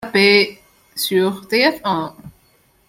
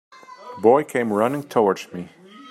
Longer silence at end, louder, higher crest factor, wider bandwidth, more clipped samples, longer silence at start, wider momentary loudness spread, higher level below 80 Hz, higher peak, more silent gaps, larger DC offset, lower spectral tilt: first, 0.6 s vs 0 s; first, -16 LUFS vs -20 LUFS; about the same, 18 dB vs 20 dB; about the same, 16.5 kHz vs 15 kHz; neither; second, 0 s vs 0.3 s; second, 12 LU vs 22 LU; first, -58 dBFS vs -72 dBFS; about the same, -2 dBFS vs -2 dBFS; neither; neither; second, -4 dB/octave vs -6 dB/octave